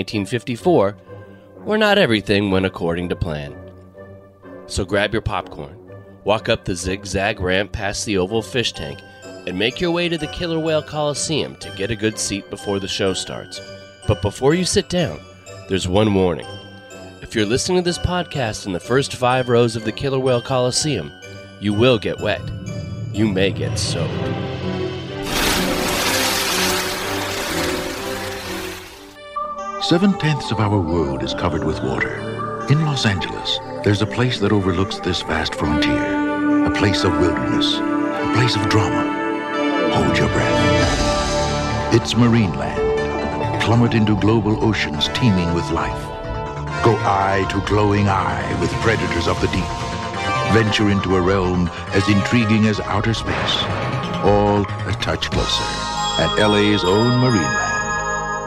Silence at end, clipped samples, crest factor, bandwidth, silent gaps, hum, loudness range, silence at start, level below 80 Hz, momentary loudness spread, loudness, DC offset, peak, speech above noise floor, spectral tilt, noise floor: 0 s; under 0.1%; 18 dB; 16 kHz; none; none; 4 LU; 0 s; -38 dBFS; 11 LU; -19 LUFS; under 0.1%; 0 dBFS; 22 dB; -5 dB/octave; -40 dBFS